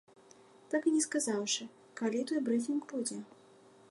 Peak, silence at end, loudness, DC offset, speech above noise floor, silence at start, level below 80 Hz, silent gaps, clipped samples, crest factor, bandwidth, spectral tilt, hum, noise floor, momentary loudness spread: -20 dBFS; 0.65 s; -34 LUFS; under 0.1%; 27 dB; 0.7 s; -88 dBFS; none; under 0.1%; 16 dB; 11.5 kHz; -3 dB/octave; none; -60 dBFS; 10 LU